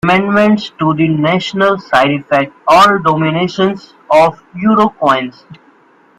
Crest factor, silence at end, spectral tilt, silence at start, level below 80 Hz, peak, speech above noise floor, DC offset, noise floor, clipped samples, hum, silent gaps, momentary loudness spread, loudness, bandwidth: 12 dB; 0.65 s; -6 dB/octave; 0.05 s; -50 dBFS; 0 dBFS; 36 dB; under 0.1%; -47 dBFS; under 0.1%; none; none; 7 LU; -12 LUFS; 15 kHz